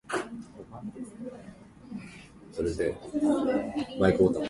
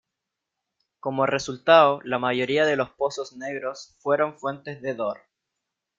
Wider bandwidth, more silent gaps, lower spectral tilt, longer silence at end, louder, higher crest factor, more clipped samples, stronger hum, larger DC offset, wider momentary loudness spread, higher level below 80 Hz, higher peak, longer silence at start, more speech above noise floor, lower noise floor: first, 11.5 kHz vs 7.6 kHz; neither; first, -6.5 dB/octave vs -4.5 dB/octave; second, 0 s vs 0.85 s; second, -29 LUFS vs -24 LUFS; about the same, 22 dB vs 22 dB; neither; neither; neither; first, 20 LU vs 16 LU; first, -52 dBFS vs -68 dBFS; second, -8 dBFS vs -4 dBFS; second, 0.1 s vs 1.05 s; second, 21 dB vs 61 dB; second, -49 dBFS vs -84 dBFS